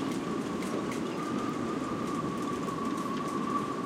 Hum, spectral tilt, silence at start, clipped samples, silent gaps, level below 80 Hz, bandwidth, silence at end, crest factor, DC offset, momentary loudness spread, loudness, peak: none; -5.5 dB/octave; 0 s; under 0.1%; none; -62 dBFS; 16.5 kHz; 0 s; 14 dB; under 0.1%; 1 LU; -33 LUFS; -18 dBFS